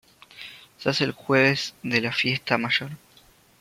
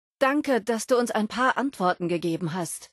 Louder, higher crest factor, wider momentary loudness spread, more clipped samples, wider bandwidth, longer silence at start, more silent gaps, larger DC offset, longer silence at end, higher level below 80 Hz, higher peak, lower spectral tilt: about the same, -23 LUFS vs -25 LUFS; first, 22 dB vs 16 dB; first, 21 LU vs 5 LU; neither; first, 16 kHz vs 12.5 kHz; first, 0.35 s vs 0.2 s; neither; neither; first, 0.65 s vs 0.05 s; about the same, -64 dBFS vs -68 dBFS; first, -4 dBFS vs -8 dBFS; about the same, -4.5 dB/octave vs -4.5 dB/octave